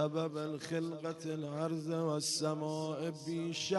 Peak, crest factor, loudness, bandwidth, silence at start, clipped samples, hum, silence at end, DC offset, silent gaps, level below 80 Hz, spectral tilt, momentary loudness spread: -20 dBFS; 16 dB; -37 LUFS; 11.5 kHz; 0 s; under 0.1%; none; 0 s; under 0.1%; none; -80 dBFS; -4.5 dB/octave; 6 LU